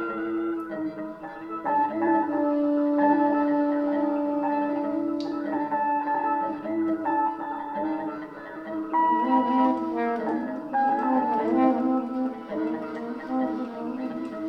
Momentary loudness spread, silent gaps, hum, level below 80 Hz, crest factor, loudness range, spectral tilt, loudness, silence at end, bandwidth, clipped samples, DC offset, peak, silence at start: 10 LU; none; none; -68 dBFS; 16 dB; 3 LU; -7.5 dB/octave; -26 LUFS; 0 s; 6 kHz; under 0.1%; under 0.1%; -10 dBFS; 0 s